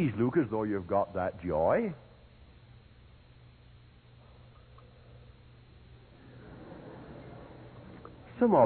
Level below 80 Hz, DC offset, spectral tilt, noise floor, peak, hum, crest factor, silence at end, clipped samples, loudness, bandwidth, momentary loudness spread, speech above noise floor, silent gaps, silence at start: -58 dBFS; under 0.1%; -7.5 dB/octave; -56 dBFS; -12 dBFS; none; 22 dB; 0 s; under 0.1%; -30 LUFS; 4.5 kHz; 28 LU; 28 dB; none; 0 s